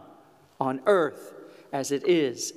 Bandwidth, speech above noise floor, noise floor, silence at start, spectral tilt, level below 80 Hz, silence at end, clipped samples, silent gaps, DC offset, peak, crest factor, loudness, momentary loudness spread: 15 kHz; 30 dB; -55 dBFS; 0.6 s; -4 dB/octave; -82 dBFS; 0.05 s; under 0.1%; none; under 0.1%; -10 dBFS; 18 dB; -26 LUFS; 15 LU